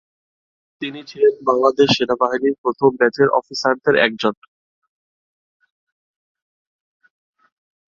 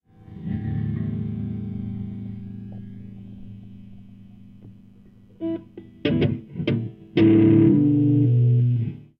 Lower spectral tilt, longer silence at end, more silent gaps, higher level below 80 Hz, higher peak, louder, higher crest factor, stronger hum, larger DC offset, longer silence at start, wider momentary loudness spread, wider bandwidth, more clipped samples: second, -5 dB/octave vs -11.5 dB/octave; first, 3.6 s vs 0.2 s; first, 2.58-2.64 s vs none; second, -62 dBFS vs -48 dBFS; first, -2 dBFS vs -6 dBFS; first, -17 LUFS vs -22 LUFS; about the same, 20 dB vs 18 dB; neither; neither; first, 0.8 s vs 0.3 s; second, 14 LU vs 24 LU; first, 7.4 kHz vs 5.2 kHz; neither